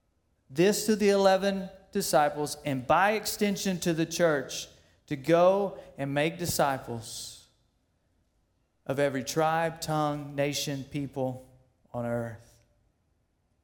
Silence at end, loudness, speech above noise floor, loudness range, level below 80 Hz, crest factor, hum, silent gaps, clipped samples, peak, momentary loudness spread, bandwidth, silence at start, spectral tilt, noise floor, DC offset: 1.25 s; -28 LUFS; 45 dB; 7 LU; -62 dBFS; 20 dB; none; none; under 0.1%; -10 dBFS; 14 LU; 18 kHz; 0.5 s; -4.5 dB/octave; -73 dBFS; under 0.1%